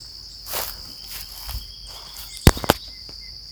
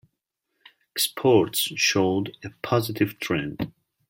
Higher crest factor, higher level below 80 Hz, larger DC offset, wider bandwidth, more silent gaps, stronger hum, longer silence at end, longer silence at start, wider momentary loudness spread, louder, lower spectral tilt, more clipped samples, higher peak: first, 26 dB vs 18 dB; first, -32 dBFS vs -60 dBFS; neither; first, over 20 kHz vs 16.5 kHz; neither; neither; second, 0 s vs 0.4 s; second, 0 s vs 0.95 s; first, 17 LU vs 14 LU; about the same, -25 LUFS vs -24 LUFS; about the same, -4.5 dB/octave vs -4 dB/octave; neither; first, 0 dBFS vs -6 dBFS